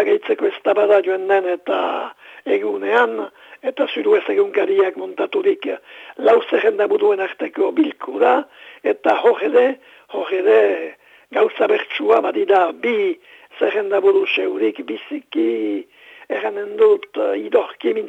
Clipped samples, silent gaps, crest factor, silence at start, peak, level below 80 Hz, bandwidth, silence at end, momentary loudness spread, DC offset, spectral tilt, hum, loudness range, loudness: under 0.1%; none; 14 dB; 0 s; -4 dBFS; -74 dBFS; 5.6 kHz; 0 s; 12 LU; under 0.1%; -5 dB/octave; none; 3 LU; -18 LUFS